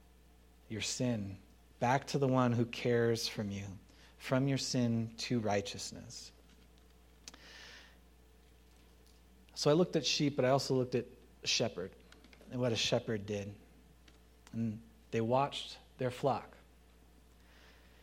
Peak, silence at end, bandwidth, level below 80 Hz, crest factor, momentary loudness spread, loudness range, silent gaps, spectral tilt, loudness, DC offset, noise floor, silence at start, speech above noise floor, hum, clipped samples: -16 dBFS; 1.5 s; 16 kHz; -64 dBFS; 20 dB; 20 LU; 7 LU; none; -5 dB/octave; -35 LUFS; under 0.1%; -62 dBFS; 0.7 s; 28 dB; none; under 0.1%